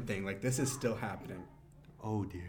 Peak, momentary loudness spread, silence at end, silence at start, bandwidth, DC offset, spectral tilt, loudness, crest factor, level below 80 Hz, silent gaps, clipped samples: -22 dBFS; 14 LU; 0 s; 0 s; 19 kHz; under 0.1%; -5 dB/octave; -37 LUFS; 16 dB; -60 dBFS; none; under 0.1%